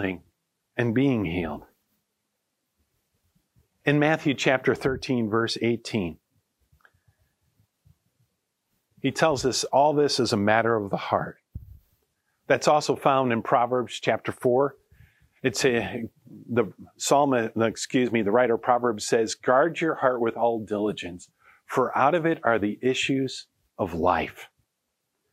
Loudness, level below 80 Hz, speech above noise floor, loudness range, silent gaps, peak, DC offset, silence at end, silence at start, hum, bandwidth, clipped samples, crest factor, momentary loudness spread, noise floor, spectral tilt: -24 LUFS; -58 dBFS; 55 dB; 7 LU; none; -4 dBFS; under 0.1%; 0.85 s; 0 s; none; 15.5 kHz; under 0.1%; 22 dB; 11 LU; -79 dBFS; -5 dB/octave